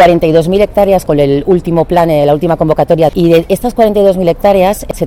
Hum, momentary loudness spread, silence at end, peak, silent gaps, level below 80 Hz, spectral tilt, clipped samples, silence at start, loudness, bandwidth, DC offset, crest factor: none; 3 LU; 0 s; 0 dBFS; none; -30 dBFS; -7 dB/octave; 0.3%; 0 s; -9 LUFS; 17 kHz; under 0.1%; 8 dB